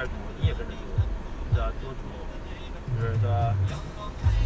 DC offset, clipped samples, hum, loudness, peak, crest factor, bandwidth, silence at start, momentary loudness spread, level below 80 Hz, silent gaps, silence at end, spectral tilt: under 0.1%; under 0.1%; none; -30 LUFS; -12 dBFS; 16 dB; 8 kHz; 0 s; 13 LU; -32 dBFS; none; 0 s; -7.5 dB/octave